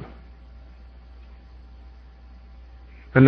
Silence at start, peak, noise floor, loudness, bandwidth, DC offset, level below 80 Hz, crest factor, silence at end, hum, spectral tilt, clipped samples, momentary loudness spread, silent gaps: 0 s; -2 dBFS; -45 dBFS; -35 LUFS; 4.9 kHz; under 0.1%; -44 dBFS; 24 dB; 0 s; none; -11.5 dB/octave; under 0.1%; 4 LU; none